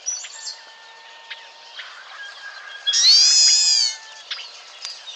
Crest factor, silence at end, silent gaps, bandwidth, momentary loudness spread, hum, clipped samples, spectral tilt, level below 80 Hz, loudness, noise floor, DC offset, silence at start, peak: 16 dB; 0 s; none; 15.5 kHz; 26 LU; none; under 0.1%; 7.5 dB/octave; under -90 dBFS; -13 LUFS; -43 dBFS; under 0.1%; 0.05 s; -6 dBFS